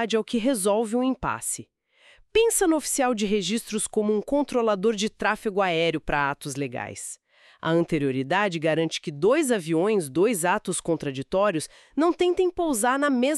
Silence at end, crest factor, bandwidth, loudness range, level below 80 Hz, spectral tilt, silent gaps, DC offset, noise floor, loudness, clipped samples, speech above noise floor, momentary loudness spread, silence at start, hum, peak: 0 s; 16 dB; 13.5 kHz; 2 LU; -52 dBFS; -4 dB/octave; none; under 0.1%; -57 dBFS; -24 LUFS; under 0.1%; 33 dB; 8 LU; 0 s; none; -8 dBFS